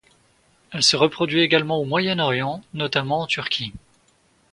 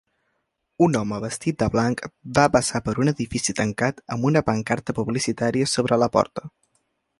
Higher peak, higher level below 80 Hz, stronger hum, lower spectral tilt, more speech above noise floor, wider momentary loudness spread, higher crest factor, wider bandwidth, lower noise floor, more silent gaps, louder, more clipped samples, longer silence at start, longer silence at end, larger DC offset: about the same, -2 dBFS vs -2 dBFS; second, -58 dBFS vs -50 dBFS; neither; second, -3.5 dB/octave vs -5 dB/octave; second, 39 dB vs 52 dB; first, 10 LU vs 6 LU; about the same, 22 dB vs 20 dB; about the same, 11.5 kHz vs 11.5 kHz; second, -61 dBFS vs -74 dBFS; neither; about the same, -20 LUFS vs -22 LUFS; neither; about the same, 0.7 s vs 0.8 s; about the same, 0.75 s vs 0.7 s; neither